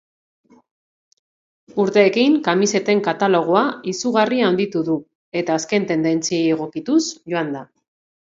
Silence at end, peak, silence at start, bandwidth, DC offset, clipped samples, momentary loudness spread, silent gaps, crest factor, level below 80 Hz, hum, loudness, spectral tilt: 0.65 s; -2 dBFS; 1.75 s; 7.8 kHz; under 0.1%; under 0.1%; 9 LU; 5.15-5.32 s; 18 dB; -68 dBFS; none; -19 LUFS; -4.5 dB/octave